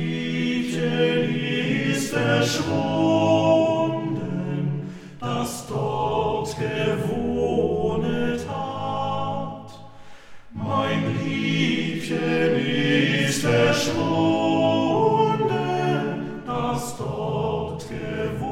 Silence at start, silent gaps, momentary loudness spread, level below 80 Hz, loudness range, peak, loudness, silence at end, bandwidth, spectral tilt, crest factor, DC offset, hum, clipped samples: 0 s; none; 9 LU; -52 dBFS; 6 LU; -6 dBFS; -23 LUFS; 0 s; 16 kHz; -5.5 dB/octave; 16 dB; under 0.1%; none; under 0.1%